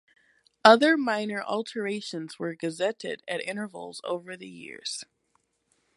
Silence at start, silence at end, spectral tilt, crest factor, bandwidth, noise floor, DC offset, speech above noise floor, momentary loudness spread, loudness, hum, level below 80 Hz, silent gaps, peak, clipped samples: 0.65 s; 0.95 s; -4 dB/octave; 26 dB; 11.5 kHz; -73 dBFS; under 0.1%; 45 dB; 18 LU; -26 LUFS; none; -80 dBFS; none; -2 dBFS; under 0.1%